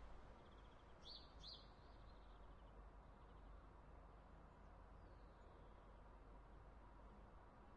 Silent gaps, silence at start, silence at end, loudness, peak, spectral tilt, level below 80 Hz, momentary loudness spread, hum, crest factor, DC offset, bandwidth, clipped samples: none; 0 s; 0 s; -64 LUFS; -46 dBFS; -3.5 dB/octave; -66 dBFS; 7 LU; none; 16 dB; under 0.1%; 7.2 kHz; under 0.1%